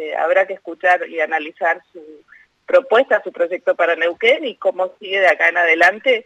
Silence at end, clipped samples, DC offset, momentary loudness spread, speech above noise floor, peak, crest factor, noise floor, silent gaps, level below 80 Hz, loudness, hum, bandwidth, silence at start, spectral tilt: 0.05 s; under 0.1%; under 0.1%; 8 LU; 33 dB; -2 dBFS; 14 dB; -50 dBFS; none; -72 dBFS; -16 LUFS; none; 9 kHz; 0 s; -2.5 dB/octave